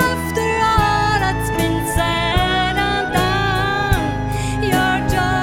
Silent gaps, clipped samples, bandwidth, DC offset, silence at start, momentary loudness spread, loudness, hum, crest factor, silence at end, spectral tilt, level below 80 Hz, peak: none; under 0.1%; 17 kHz; under 0.1%; 0 s; 4 LU; -17 LUFS; none; 14 dB; 0 s; -5 dB/octave; -28 dBFS; -2 dBFS